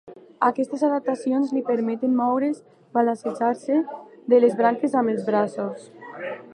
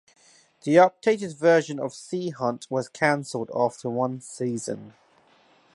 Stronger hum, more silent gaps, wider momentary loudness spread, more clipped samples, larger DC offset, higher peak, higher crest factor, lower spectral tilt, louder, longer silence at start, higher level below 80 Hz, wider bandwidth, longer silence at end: neither; neither; about the same, 14 LU vs 13 LU; neither; neither; about the same, -4 dBFS vs -4 dBFS; about the same, 18 dB vs 20 dB; first, -7 dB/octave vs -5.5 dB/octave; about the same, -23 LUFS vs -25 LUFS; second, 0.05 s vs 0.65 s; second, -80 dBFS vs -72 dBFS; about the same, 10.5 kHz vs 11.5 kHz; second, 0 s vs 0.85 s